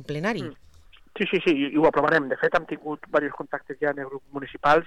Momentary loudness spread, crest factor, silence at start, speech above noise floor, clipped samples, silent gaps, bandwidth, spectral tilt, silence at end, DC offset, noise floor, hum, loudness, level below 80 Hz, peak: 14 LU; 16 dB; 0 s; 22 dB; under 0.1%; none; 11 kHz; -6.5 dB/octave; 0 s; 0.2%; -47 dBFS; none; -25 LUFS; -54 dBFS; -10 dBFS